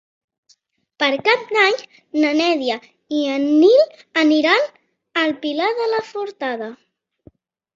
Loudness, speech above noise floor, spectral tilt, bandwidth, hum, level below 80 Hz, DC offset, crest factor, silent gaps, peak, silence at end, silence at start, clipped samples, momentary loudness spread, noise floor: -18 LUFS; 42 dB; -3.5 dB/octave; 7.6 kHz; none; -68 dBFS; under 0.1%; 18 dB; none; -2 dBFS; 1 s; 1 s; under 0.1%; 12 LU; -60 dBFS